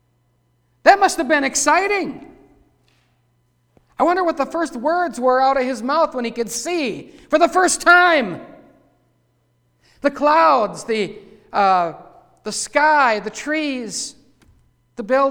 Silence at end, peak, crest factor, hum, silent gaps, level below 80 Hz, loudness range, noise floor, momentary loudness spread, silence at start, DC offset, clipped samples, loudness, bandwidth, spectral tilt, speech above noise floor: 0 s; 0 dBFS; 20 dB; none; none; -56 dBFS; 4 LU; -63 dBFS; 13 LU; 0.85 s; under 0.1%; under 0.1%; -17 LUFS; 19 kHz; -2.5 dB/octave; 46 dB